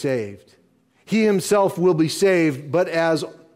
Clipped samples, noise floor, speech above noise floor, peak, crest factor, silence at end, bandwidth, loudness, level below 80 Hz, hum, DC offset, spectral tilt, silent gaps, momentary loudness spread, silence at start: under 0.1%; -58 dBFS; 39 dB; -8 dBFS; 14 dB; 0.25 s; 16 kHz; -20 LUFS; -66 dBFS; none; under 0.1%; -5.5 dB/octave; none; 7 LU; 0 s